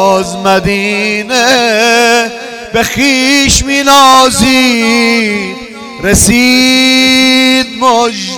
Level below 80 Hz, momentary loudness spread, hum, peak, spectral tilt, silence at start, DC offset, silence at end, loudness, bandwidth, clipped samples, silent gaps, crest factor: -30 dBFS; 8 LU; none; 0 dBFS; -2.5 dB/octave; 0 s; 0.3%; 0 s; -7 LUFS; over 20 kHz; 0.4%; none; 8 dB